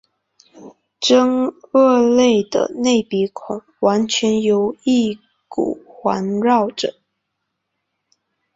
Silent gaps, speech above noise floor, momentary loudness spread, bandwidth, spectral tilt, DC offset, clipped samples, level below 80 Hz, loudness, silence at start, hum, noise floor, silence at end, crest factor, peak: none; 59 dB; 11 LU; 7.8 kHz; -4.5 dB/octave; under 0.1%; under 0.1%; -60 dBFS; -17 LUFS; 0.55 s; none; -76 dBFS; 1.65 s; 16 dB; -2 dBFS